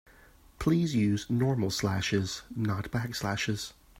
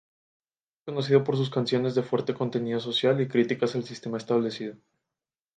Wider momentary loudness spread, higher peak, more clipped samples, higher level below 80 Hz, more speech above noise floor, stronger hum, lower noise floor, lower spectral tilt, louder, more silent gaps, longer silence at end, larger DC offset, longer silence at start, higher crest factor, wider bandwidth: second, 6 LU vs 11 LU; second, -14 dBFS vs -8 dBFS; neither; first, -54 dBFS vs -72 dBFS; second, 28 dB vs over 64 dB; neither; second, -57 dBFS vs under -90 dBFS; about the same, -5.5 dB/octave vs -6.5 dB/octave; second, -30 LUFS vs -27 LUFS; neither; second, 0 s vs 0.8 s; neither; second, 0.6 s vs 0.85 s; about the same, 16 dB vs 20 dB; first, 16 kHz vs 9.2 kHz